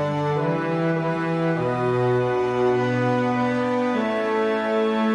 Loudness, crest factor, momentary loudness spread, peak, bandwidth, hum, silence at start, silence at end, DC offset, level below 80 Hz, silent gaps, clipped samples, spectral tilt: -22 LUFS; 12 dB; 2 LU; -10 dBFS; 10.5 kHz; none; 0 s; 0 s; under 0.1%; -58 dBFS; none; under 0.1%; -7.5 dB/octave